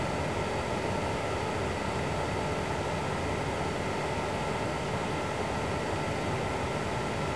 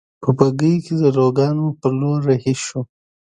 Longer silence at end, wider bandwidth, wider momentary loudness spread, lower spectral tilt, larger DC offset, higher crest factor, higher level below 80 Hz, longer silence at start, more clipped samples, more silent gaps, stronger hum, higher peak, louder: second, 0 s vs 0.4 s; first, 11 kHz vs 9.6 kHz; second, 1 LU vs 8 LU; second, -5 dB/octave vs -7 dB/octave; first, 0.3% vs under 0.1%; about the same, 12 dB vs 16 dB; first, -46 dBFS vs -56 dBFS; second, 0 s vs 0.2 s; neither; neither; neither; second, -18 dBFS vs 0 dBFS; second, -32 LUFS vs -18 LUFS